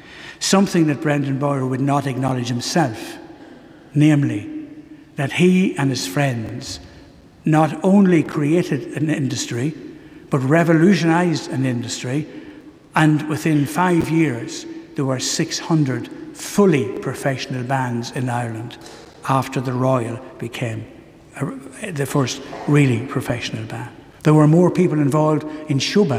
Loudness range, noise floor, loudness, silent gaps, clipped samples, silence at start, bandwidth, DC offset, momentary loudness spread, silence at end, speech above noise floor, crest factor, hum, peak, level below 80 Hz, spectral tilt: 5 LU; -44 dBFS; -19 LUFS; none; under 0.1%; 0.05 s; 15.5 kHz; under 0.1%; 16 LU; 0 s; 26 dB; 18 dB; none; -2 dBFS; -54 dBFS; -6 dB/octave